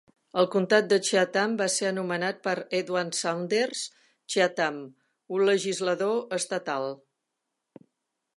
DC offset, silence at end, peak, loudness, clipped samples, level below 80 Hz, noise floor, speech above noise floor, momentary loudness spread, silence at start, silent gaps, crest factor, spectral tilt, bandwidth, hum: under 0.1%; 1.4 s; -6 dBFS; -27 LUFS; under 0.1%; -80 dBFS; -83 dBFS; 56 dB; 10 LU; 0.35 s; none; 22 dB; -3.5 dB/octave; 11.5 kHz; none